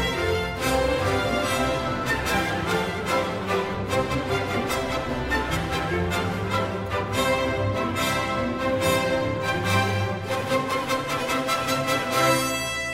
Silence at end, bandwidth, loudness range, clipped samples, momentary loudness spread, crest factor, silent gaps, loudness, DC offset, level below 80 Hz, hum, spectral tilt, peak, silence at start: 0 s; 16 kHz; 2 LU; under 0.1%; 4 LU; 18 dB; none; -24 LUFS; under 0.1%; -42 dBFS; none; -4.5 dB/octave; -8 dBFS; 0 s